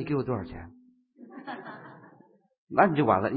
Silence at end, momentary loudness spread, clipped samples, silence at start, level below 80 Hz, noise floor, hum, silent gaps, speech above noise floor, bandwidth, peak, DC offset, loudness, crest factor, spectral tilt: 0 s; 26 LU; under 0.1%; 0 s; -56 dBFS; -59 dBFS; none; 2.58-2.67 s; 33 dB; 4.8 kHz; -6 dBFS; under 0.1%; -26 LUFS; 24 dB; -11 dB/octave